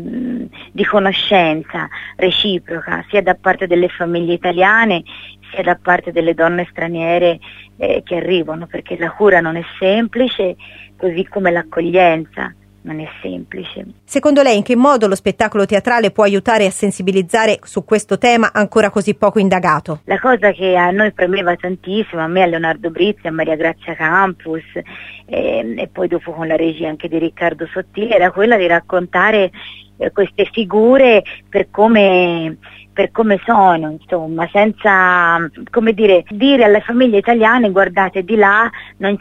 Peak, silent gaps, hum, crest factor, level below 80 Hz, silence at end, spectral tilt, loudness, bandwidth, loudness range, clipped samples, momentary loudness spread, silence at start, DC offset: 0 dBFS; none; none; 14 dB; -48 dBFS; 0 s; -5 dB/octave; -14 LUFS; 13 kHz; 5 LU; under 0.1%; 13 LU; 0 s; under 0.1%